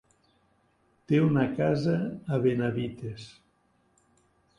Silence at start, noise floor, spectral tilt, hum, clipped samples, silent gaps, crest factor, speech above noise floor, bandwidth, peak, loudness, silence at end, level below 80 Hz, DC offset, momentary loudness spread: 1.1 s; -68 dBFS; -8.5 dB/octave; none; under 0.1%; none; 18 dB; 42 dB; 10.5 kHz; -12 dBFS; -27 LUFS; 1.3 s; -62 dBFS; under 0.1%; 16 LU